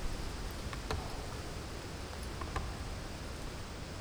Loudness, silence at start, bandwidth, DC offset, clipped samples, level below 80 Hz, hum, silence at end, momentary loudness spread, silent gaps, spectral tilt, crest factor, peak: -42 LUFS; 0 s; over 20 kHz; under 0.1%; under 0.1%; -44 dBFS; none; 0 s; 4 LU; none; -4.5 dB/octave; 20 dB; -20 dBFS